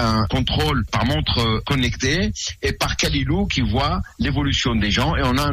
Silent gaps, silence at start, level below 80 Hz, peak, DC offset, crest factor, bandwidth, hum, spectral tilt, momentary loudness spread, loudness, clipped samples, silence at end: none; 0 s; -30 dBFS; -6 dBFS; under 0.1%; 14 dB; 15.5 kHz; none; -4.5 dB/octave; 4 LU; -20 LUFS; under 0.1%; 0 s